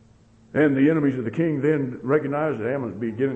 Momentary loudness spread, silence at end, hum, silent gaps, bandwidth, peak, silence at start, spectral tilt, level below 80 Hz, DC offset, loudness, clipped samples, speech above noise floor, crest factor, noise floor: 8 LU; 0 s; none; none; 7.8 kHz; -8 dBFS; 0.55 s; -9.5 dB/octave; -60 dBFS; under 0.1%; -23 LUFS; under 0.1%; 32 dB; 14 dB; -54 dBFS